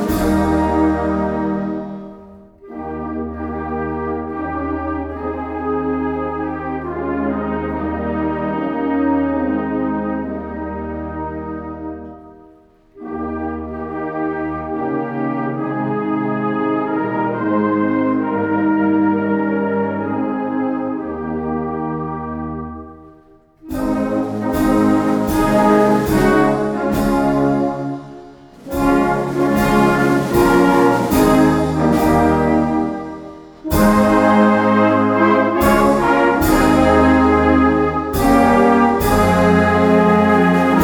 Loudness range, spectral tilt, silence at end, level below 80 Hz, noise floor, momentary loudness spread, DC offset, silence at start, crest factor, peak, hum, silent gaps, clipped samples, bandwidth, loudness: 11 LU; -6.5 dB/octave; 0 s; -36 dBFS; -48 dBFS; 13 LU; under 0.1%; 0 s; 16 dB; 0 dBFS; none; none; under 0.1%; over 20 kHz; -17 LUFS